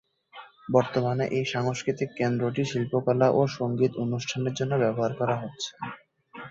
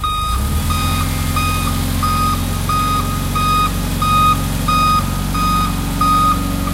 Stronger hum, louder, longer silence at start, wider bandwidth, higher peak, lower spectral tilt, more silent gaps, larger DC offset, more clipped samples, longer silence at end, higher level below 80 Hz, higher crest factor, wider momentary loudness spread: neither; second, -27 LUFS vs -16 LUFS; first, 0.35 s vs 0 s; second, 7.8 kHz vs 16 kHz; second, -6 dBFS vs -2 dBFS; first, -6 dB/octave vs -4.5 dB/octave; neither; neither; neither; about the same, 0 s vs 0 s; second, -64 dBFS vs -24 dBFS; first, 22 dB vs 14 dB; first, 12 LU vs 5 LU